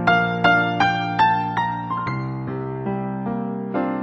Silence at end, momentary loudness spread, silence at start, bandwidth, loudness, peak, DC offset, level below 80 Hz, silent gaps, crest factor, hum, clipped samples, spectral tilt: 0 s; 10 LU; 0 s; 7.8 kHz; -21 LUFS; -2 dBFS; under 0.1%; -52 dBFS; none; 18 dB; none; under 0.1%; -7 dB/octave